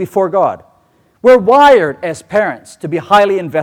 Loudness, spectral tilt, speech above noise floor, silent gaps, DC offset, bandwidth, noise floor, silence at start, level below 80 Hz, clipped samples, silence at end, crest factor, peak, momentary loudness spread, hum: -11 LUFS; -5.5 dB/octave; 42 dB; none; under 0.1%; 15.5 kHz; -53 dBFS; 0 s; -50 dBFS; under 0.1%; 0 s; 12 dB; 0 dBFS; 14 LU; none